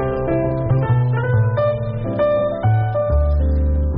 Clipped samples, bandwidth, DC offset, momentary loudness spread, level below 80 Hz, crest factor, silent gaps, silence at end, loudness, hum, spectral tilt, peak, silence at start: under 0.1%; 3.9 kHz; under 0.1%; 3 LU; -24 dBFS; 10 dB; none; 0 s; -18 LUFS; none; -8.5 dB/octave; -8 dBFS; 0 s